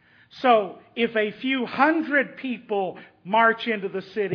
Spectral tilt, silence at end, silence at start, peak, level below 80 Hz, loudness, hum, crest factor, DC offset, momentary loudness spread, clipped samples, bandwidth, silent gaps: -7 dB/octave; 0 s; 0.35 s; -4 dBFS; -74 dBFS; -23 LUFS; none; 20 dB; under 0.1%; 11 LU; under 0.1%; 5.4 kHz; none